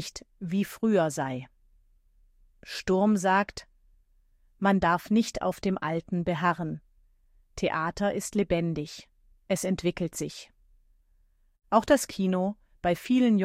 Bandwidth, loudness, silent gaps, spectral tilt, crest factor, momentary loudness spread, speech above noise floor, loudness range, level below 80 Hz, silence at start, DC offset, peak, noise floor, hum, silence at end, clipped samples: 16 kHz; -28 LUFS; none; -5.5 dB/octave; 20 dB; 14 LU; 38 dB; 4 LU; -54 dBFS; 0 s; under 0.1%; -8 dBFS; -65 dBFS; none; 0 s; under 0.1%